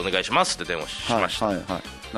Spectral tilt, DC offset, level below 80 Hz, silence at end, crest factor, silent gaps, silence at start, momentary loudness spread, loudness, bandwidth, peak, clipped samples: -3 dB/octave; under 0.1%; -48 dBFS; 0 s; 20 dB; none; 0 s; 8 LU; -24 LUFS; 13.5 kHz; -6 dBFS; under 0.1%